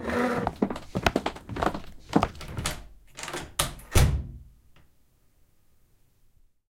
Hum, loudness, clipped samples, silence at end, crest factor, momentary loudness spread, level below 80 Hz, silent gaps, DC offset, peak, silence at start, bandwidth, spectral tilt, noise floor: none; -29 LUFS; under 0.1%; 2.2 s; 26 dB; 16 LU; -36 dBFS; none; under 0.1%; -4 dBFS; 0 s; 17 kHz; -5 dB/octave; -62 dBFS